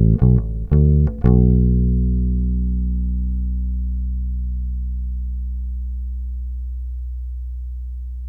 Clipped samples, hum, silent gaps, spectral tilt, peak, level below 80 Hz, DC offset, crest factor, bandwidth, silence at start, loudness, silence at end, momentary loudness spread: under 0.1%; 60 Hz at -55 dBFS; none; -13 dB/octave; -4 dBFS; -20 dBFS; under 0.1%; 16 dB; 1.9 kHz; 0 s; -21 LUFS; 0 s; 15 LU